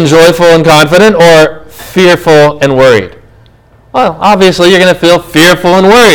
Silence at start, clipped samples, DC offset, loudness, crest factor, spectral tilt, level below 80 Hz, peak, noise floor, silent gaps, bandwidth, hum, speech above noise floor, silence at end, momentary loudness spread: 0 s; 20%; under 0.1%; -5 LUFS; 4 dB; -4.5 dB/octave; -34 dBFS; 0 dBFS; -40 dBFS; none; over 20 kHz; none; 36 dB; 0 s; 7 LU